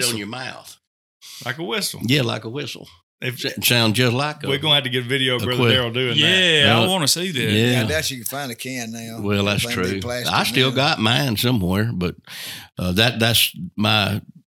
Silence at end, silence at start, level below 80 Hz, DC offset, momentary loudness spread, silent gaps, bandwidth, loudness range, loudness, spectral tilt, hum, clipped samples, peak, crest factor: 0.3 s; 0 s; -52 dBFS; under 0.1%; 14 LU; 0.87-1.20 s, 3.03-3.18 s; 18 kHz; 5 LU; -19 LUFS; -4 dB/octave; none; under 0.1%; 0 dBFS; 20 dB